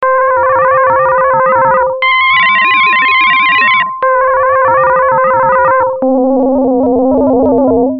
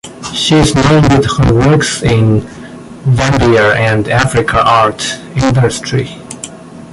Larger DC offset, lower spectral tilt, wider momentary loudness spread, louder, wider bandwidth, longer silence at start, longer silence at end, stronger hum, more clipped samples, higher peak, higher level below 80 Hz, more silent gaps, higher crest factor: neither; first, -8 dB/octave vs -5.5 dB/octave; second, 4 LU vs 16 LU; about the same, -9 LUFS vs -10 LUFS; second, 5.4 kHz vs 11.5 kHz; about the same, 0 s vs 0.05 s; about the same, 0 s vs 0 s; neither; neither; about the same, 0 dBFS vs 0 dBFS; second, -40 dBFS vs -28 dBFS; neither; about the same, 8 dB vs 10 dB